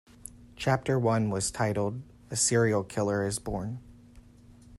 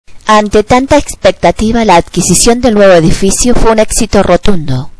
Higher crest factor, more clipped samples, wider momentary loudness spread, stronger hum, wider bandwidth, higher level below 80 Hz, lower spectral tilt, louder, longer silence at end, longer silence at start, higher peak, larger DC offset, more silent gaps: first, 18 dB vs 8 dB; second, under 0.1% vs 4%; first, 18 LU vs 5 LU; neither; first, 13.5 kHz vs 11 kHz; second, -54 dBFS vs -20 dBFS; about the same, -4.5 dB/octave vs -4.5 dB/octave; second, -28 LUFS vs -8 LUFS; about the same, 0 s vs 0.1 s; first, 0.25 s vs 0.05 s; second, -12 dBFS vs 0 dBFS; second, under 0.1% vs 3%; neither